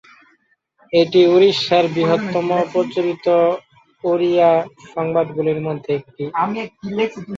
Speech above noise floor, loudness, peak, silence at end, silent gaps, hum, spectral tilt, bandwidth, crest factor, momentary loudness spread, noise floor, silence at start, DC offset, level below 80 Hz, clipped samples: 44 dB; -18 LUFS; -2 dBFS; 0 s; none; none; -6.5 dB/octave; 7.6 kHz; 16 dB; 12 LU; -61 dBFS; 0.9 s; under 0.1%; -62 dBFS; under 0.1%